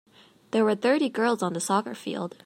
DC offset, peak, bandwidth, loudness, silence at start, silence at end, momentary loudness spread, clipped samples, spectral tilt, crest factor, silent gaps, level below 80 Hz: under 0.1%; -10 dBFS; 16 kHz; -26 LUFS; 0.55 s; 0.15 s; 10 LU; under 0.1%; -4.5 dB/octave; 16 dB; none; -78 dBFS